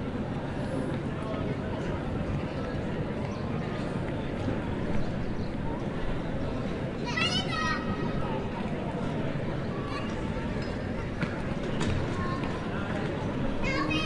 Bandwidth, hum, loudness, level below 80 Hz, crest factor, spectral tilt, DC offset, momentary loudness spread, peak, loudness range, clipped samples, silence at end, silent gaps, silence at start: 11.5 kHz; none; -32 LUFS; -42 dBFS; 16 dB; -6.5 dB/octave; under 0.1%; 4 LU; -14 dBFS; 2 LU; under 0.1%; 0 s; none; 0 s